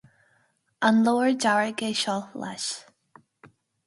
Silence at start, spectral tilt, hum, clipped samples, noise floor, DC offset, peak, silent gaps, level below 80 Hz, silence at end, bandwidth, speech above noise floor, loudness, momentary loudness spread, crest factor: 0.8 s; -3.5 dB/octave; none; under 0.1%; -68 dBFS; under 0.1%; -6 dBFS; none; -74 dBFS; 1.05 s; 11.5 kHz; 44 dB; -24 LUFS; 11 LU; 20 dB